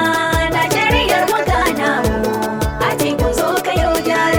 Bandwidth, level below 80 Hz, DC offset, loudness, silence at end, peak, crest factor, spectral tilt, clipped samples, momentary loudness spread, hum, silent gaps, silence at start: over 20 kHz; -28 dBFS; under 0.1%; -16 LUFS; 0 s; -2 dBFS; 14 dB; -4.5 dB/octave; under 0.1%; 5 LU; none; none; 0 s